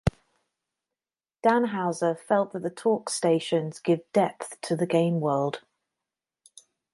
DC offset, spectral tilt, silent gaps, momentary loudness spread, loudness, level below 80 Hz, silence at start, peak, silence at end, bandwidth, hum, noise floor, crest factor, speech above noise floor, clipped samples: under 0.1%; -6 dB/octave; none; 7 LU; -26 LUFS; -52 dBFS; 0.05 s; -8 dBFS; 1.35 s; 11.5 kHz; none; under -90 dBFS; 20 dB; over 65 dB; under 0.1%